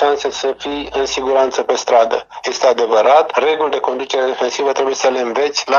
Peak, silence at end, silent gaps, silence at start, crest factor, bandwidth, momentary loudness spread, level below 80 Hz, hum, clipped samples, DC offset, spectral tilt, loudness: 0 dBFS; 0 s; none; 0 s; 14 dB; 7.6 kHz; 8 LU; -52 dBFS; none; under 0.1%; under 0.1%; -1.5 dB/octave; -15 LUFS